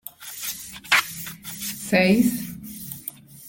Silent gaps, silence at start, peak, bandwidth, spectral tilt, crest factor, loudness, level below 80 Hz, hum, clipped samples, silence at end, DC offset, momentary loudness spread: none; 0.05 s; -4 dBFS; 17 kHz; -4 dB/octave; 22 dB; -23 LUFS; -56 dBFS; none; under 0.1%; 0 s; under 0.1%; 16 LU